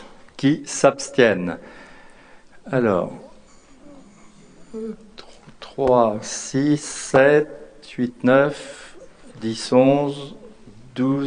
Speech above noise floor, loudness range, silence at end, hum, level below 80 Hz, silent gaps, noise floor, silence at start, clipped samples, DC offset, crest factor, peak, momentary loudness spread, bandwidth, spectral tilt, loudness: 28 dB; 9 LU; 0 s; none; -56 dBFS; none; -47 dBFS; 0 s; under 0.1%; under 0.1%; 22 dB; 0 dBFS; 20 LU; 10 kHz; -5 dB/octave; -20 LUFS